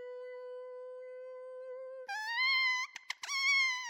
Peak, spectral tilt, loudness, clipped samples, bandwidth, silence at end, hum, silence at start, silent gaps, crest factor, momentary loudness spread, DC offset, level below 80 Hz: -20 dBFS; 5 dB/octave; -31 LUFS; under 0.1%; 19.5 kHz; 0 s; none; 0 s; none; 16 dB; 19 LU; under 0.1%; under -90 dBFS